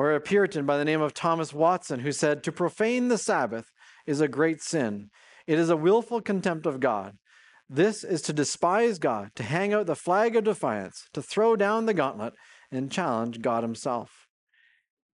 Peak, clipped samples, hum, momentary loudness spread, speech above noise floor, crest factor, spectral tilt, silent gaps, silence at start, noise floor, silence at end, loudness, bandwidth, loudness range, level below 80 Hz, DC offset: -10 dBFS; under 0.1%; none; 10 LU; 32 dB; 16 dB; -5 dB/octave; none; 0 s; -58 dBFS; 1.05 s; -26 LUFS; 11.5 kHz; 2 LU; -74 dBFS; under 0.1%